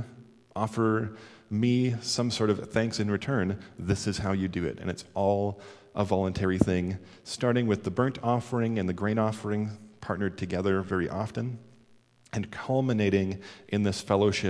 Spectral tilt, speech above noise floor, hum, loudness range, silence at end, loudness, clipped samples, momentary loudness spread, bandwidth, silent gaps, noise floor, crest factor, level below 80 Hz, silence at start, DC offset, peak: -6 dB/octave; 32 dB; none; 3 LU; 0 s; -29 LUFS; under 0.1%; 11 LU; 11 kHz; none; -60 dBFS; 20 dB; -56 dBFS; 0 s; under 0.1%; -8 dBFS